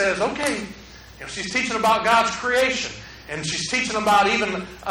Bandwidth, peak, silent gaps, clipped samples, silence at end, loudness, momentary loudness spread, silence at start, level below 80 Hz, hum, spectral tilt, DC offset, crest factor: over 20 kHz; -6 dBFS; none; under 0.1%; 0 s; -21 LUFS; 16 LU; 0 s; -48 dBFS; none; -2.5 dB/octave; under 0.1%; 18 dB